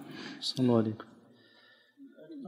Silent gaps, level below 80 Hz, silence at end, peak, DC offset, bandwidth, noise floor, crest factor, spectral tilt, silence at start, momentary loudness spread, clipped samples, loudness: none; -78 dBFS; 0 s; -14 dBFS; under 0.1%; 13.5 kHz; -62 dBFS; 22 dB; -6.5 dB/octave; 0 s; 24 LU; under 0.1%; -31 LUFS